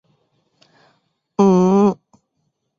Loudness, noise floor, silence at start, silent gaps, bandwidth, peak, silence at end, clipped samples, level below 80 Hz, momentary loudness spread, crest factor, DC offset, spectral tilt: -15 LUFS; -71 dBFS; 1.4 s; none; 7.4 kHz; -2 dBFS; 0.85 s; under 0.1%; -62 dBFS; 16 LU; 16 dB; under 0.1%; -8.5 dB/octave